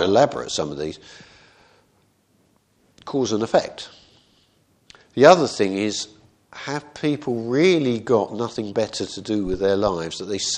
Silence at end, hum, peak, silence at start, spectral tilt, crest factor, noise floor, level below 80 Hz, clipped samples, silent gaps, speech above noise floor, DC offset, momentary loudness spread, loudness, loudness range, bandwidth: 0 s; none; 0 dBFS; 0 s; -4.5 dB/octave; 22 dB; -62 dBFS; -52 dBFS; under 0.1%; none; 41 dB; under 0.1%; 16 LU; -21 LUFS; 8 LU; 10 kHz